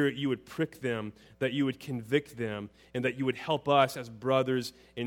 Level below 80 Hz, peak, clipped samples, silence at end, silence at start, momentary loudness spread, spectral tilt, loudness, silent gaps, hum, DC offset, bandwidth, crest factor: -66 dBFS; -10 dBFS; under 0.1%; 0 s; 0 s; 11 LU; -6 dB/octave; -31 LUFS; none; none; under 0.1%; 17.5 kHz; 20 dB